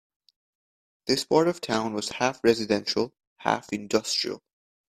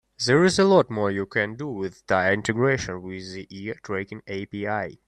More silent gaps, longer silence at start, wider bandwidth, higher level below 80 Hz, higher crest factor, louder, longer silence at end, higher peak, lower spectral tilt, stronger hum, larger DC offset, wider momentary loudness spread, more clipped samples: first, 3.27-3.36 s vs none; first, 1.05 s vs 0.2 s; first, 15 kHz vs 11 kHz; second, -64 dBFS vs -56 dBFS; first, 24 dB vs 18 dB; second, -26 LUFS vs -23 LUFS; first, 0.6 s vs 0.1 s; about the same, -4 dBFS vs -6 dBFS; second, -3.5 dB/octave vs -5 dB/octave; neither; neither; second, 10 LU vs 16 LU; neither